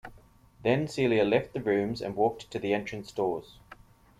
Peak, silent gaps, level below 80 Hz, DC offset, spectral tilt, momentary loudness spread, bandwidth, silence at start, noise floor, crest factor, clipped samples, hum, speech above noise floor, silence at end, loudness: -10 dBFS; none; -58 dBFS; under 0.1%; -6.5 dB/octave; 7 LU; 14 kHz; 0.05 s; -56 dBFS; 20 dB; under 0.1%; none; 28 dB; 0.45 s; -29 LUFS